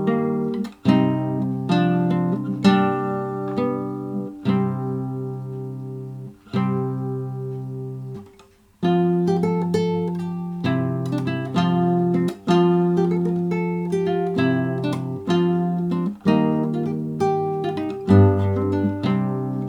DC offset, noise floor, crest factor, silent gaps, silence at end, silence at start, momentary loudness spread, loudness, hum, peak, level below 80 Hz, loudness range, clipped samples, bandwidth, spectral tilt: under 0.1%; -52 dBFS; 18 dB; none; 0 s; 0 s; 11 LU; -22 LUFS; none; -4 dBFS; -60 dBFS; 6 LU; under 0.1%; 9.2 kHz; -8.5 dB/octave